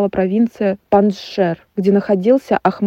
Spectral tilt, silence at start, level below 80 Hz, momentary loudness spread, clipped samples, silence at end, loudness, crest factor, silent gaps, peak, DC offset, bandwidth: -8 dB/octave; 0 s; -52 dBFS; 5 LU; under 0.1%; 0 s; -16 LUFS; 14 dB; none; 0 dBFS; under 0.1%; 7.8 kHz